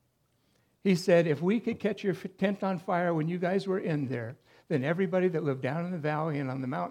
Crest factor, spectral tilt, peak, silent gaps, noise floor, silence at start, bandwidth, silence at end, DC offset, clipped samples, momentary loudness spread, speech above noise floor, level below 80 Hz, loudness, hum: 18 dB; -7.5 dB/octave; -12 dBFS; none; -72 dBFS; 0.85 s; 13.5 kHz; 0 s; under 0.1%; under 0.1%; 9 LU; 43 dB; -76 dBFS; -30 LUFS; none